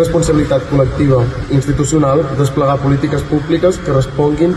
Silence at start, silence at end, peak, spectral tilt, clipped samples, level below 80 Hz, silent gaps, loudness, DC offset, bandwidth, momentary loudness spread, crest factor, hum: 0 s; 0 s; -2 dBFS; -7 dB/octave; under 0.1%; -28 dBFS; none; -13 LUFS; under 0.1%; 12.5 kHz; 3 LU; 12 dB; none